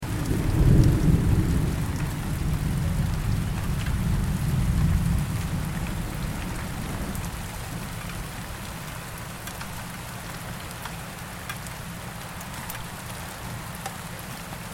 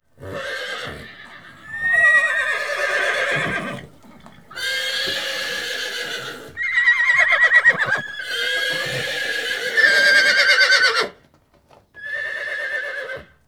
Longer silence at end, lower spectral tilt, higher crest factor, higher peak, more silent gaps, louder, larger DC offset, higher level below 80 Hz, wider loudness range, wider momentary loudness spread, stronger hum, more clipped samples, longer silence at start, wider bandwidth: second, 0 s vs 0.25 s; first, -6 dB/octave vs -1 dB/octave; about the same, 22 dB vs 18 dB; about the same, -4 dBFS vs -2 dBFS; neither; second, -28 LUFS vs -17 LUFS; second, under 0.1% vs 0.3%; first, -32 dBFS vs -58 dBFS; first, 11 LU vs 7 LU; second, 13 LU vs 17 LU; neither; neither; second, 0 s vs 0.2 s; second, 17 kHz vs over 20 kHz